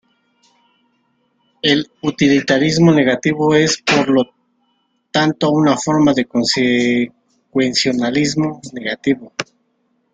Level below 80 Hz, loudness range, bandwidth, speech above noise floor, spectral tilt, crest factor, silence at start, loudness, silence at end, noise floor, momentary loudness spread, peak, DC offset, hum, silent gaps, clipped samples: -54 dBFS; 3 LU; 9.4 kHz; 50 dB; -4.5 dB/octave; 16 dB; 1.65 s; -15 LUFS; 0.7 s; -64 dBFS; 10 LU; 0 dBFS; under 0.1%; none; none; under 0.1%